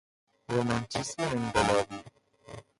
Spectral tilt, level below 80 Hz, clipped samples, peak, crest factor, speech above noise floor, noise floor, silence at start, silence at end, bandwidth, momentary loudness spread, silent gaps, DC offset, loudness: -4.5 dB/octave; -54 dBFS; under 0.1%; -12 dBFS; 20 dB; 25 dB; -54 dBFS; 0.5 s; 0.2 s; 11.5 kHz; 19 LU; none; under 0.1%; -30 LUFS